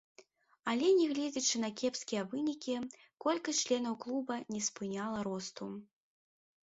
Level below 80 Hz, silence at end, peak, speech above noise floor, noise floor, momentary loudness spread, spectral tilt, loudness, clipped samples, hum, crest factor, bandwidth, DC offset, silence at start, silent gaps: -78 dBFS; 0.8 s; -20 dBFS; 29 dB; -64 dBFS; 12 LU; -3.5 dB/octave; -35 LUFS; under 0.1%; none; 16 dB; 8 kHz; under 0.1%; 0.2 s; none